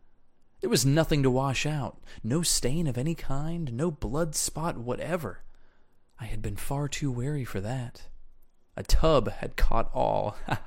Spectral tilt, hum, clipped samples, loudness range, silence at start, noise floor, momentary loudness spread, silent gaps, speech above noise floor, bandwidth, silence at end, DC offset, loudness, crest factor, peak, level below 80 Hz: -5 dB/octave; none; under 0.1%; 7 LU; 0.6 s; -56 dBFS; 13 LU; none; 29 dB; 16.5 kHz; 0 s; under 0.1%; -29 LUFS; 18 dB; -10 dBFS; -34 dBFS